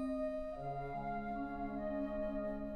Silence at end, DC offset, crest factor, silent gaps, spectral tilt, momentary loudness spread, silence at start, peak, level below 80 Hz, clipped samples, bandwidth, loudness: 0 s; under 0.1%; 10 dB; none; -9 dB/octave; 3 LU; 0 s; -30 dBFS; -54 dBFS; under 0.1%; 9.2 kHz; -42 LUFS